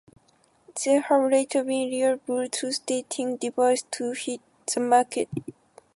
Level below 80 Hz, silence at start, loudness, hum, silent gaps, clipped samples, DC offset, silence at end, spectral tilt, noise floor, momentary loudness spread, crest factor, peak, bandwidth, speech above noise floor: -72 dBFS; 0.7 s; -25 LUFS; none; none; under 0.1%; under 0.1%; 0.45 s; -3.5 dB/octave; -63 dBFS; 11 LU; 18 dB; -8 dBFS; 11.5 kHz; 39 dB